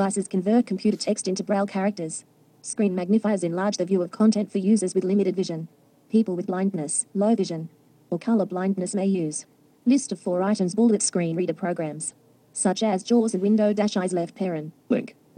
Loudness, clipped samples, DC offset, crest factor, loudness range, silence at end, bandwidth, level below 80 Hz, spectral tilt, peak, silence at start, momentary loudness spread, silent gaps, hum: -24 LUFS; under 0.1%; under 0.1%; 14 dB; 2 LU; 0.25 s; 10.5 kHz; -76 dBFS; -5.5 dB/octave; -10 dBFS; 0 s; 10 LU; none; none